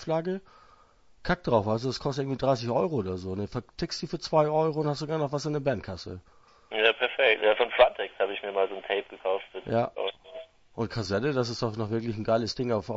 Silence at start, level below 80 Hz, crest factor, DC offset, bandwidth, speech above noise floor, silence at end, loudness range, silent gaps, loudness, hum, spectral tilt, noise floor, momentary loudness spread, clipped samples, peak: 0 s; -54 dBFS; 22 dB; under 0.1%; 8 kHz; 30 dB; 0 s; 5 LU; none; -28 LUFS; none; -5.5 dB/octave; -58 dBFS; 12 LU; under 0.1%; -6 dBFS